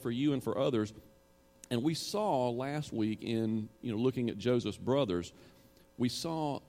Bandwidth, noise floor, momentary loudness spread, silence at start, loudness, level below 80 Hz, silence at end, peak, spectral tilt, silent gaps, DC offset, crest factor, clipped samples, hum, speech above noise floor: 16.5 kHz; -60 dBFS; 6 LU; 0 s; -34 LUFS; -66 dBFS; 0.1 s; -18 dBFS; -6 dB/octave; none; under 0.1%; 16 dB; under 0.1%; none; 27 dB